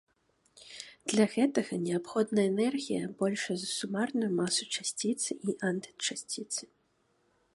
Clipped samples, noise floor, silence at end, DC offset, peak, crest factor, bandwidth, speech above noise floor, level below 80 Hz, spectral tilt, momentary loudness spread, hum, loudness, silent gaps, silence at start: under 0.1%; -73 dBFS; 0.9 s; under 0.1%; -12 dBFS; 20 dB; 11.5 kHz; 42 dB; -76 dBFS; -4 dB/octave; 9 LU; none; -32 LUFS; none; 0.55 s